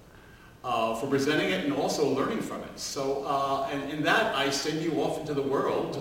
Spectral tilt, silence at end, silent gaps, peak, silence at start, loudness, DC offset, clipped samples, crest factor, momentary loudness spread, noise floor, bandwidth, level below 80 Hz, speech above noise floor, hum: -4 dB/octave; 0 s; none; -10 dBFS; 0 s; -28 LUFS; under 0.1%; under 0.1%; 18 dB; 7 LU; -51 dBFS; 16.5 kHz; -58 dBFS; 23 dB; none